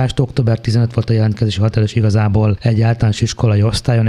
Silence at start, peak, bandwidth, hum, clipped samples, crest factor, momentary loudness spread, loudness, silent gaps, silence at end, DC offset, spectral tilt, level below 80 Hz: 0 s; -2 dBFS; 11 kHz; none; under 0.1%; 12 dB; 2 LU; -15 LUFS; none; 0 s; under 0.1%; -7 dB/octave; -34 dBFS